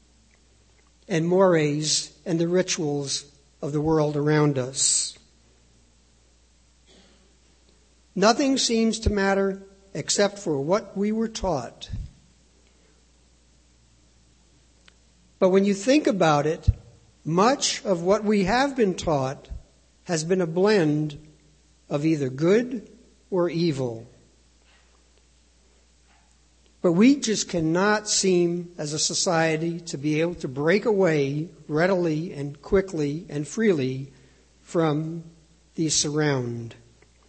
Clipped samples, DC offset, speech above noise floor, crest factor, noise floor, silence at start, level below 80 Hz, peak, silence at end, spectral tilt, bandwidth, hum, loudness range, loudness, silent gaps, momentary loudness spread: under 0.1%; under 0.1%; 36 dB; 22 dB; -59 dBFS; 1.1 s; -46 dBFS; -4 dBFS; 0.55 s; -4.5 dB/octave; 8.8 kHz; none; 7 LU; -23 LUFS; none; 13 LU